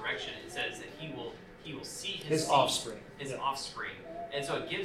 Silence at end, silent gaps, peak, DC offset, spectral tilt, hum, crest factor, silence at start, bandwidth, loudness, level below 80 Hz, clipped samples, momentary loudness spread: 0 s; none; -12 dBFS; under 0.1%; -3 dB/octave; none; 24 dB; 0 s; 16 kHz; -34 LUFS; -62 dBFS; under 0.1%; 16 LU